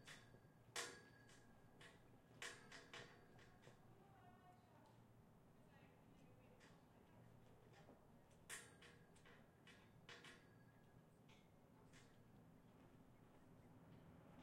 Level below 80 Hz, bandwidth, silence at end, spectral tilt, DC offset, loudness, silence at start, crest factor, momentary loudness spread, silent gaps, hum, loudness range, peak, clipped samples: -82 dBFS; 16 kHz; 0 s; -3 dB/octave; under 0.1%; -63 LUFS; 0 s; 30 dB; 14 LU; none; none; 11 LU; -34 dBFS; under 0.1%